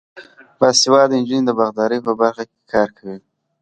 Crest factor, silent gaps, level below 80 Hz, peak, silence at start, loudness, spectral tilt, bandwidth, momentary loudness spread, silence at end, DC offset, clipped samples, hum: 18 dB; none; -60 dBFS; 0 dBFS; 0.15 s; -16 LUFS; -3.5 dB/octave; 9.4 kHz; 20 LU; 0.45 s; under 0.1%; under 0.1%; none